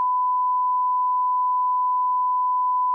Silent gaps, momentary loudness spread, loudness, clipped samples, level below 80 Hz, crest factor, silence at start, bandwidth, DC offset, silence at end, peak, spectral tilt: none; 0 LU; -21 LUFS; under 0.1%; under -90 dBFS; 4 dB; 0 s; 1.3 kHz; under 0.1%; 0 s; -18 dBFS; -1 dB/octave